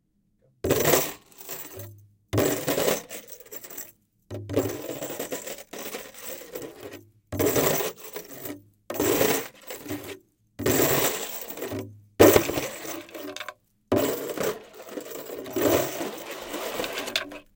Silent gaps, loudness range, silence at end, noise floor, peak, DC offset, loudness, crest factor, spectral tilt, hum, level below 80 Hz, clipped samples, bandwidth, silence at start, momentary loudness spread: none; 10 LU; 0.15 s; -67 dBFS; 0 dBFS; under 0.1%; -26 LUFS; 28 dB; -3.5 dB/octave; none; -56 dBFS; under 0.1%; 17 kHz; 0.65 s; 18 LU